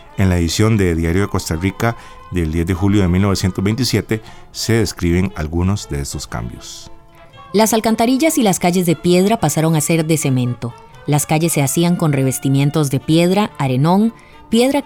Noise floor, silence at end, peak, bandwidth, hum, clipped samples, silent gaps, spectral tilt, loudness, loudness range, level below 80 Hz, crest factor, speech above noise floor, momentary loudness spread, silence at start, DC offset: -40 dBFS; 0 s; -2 dBFS; 19.5 kHz; none; under 0.1%; none; -5.5 dB/octave; -16 LUFS; 4 LU; -38 dBFS; 14 dB; 25 dB; 10 LU; 0.15 s; under 0.1%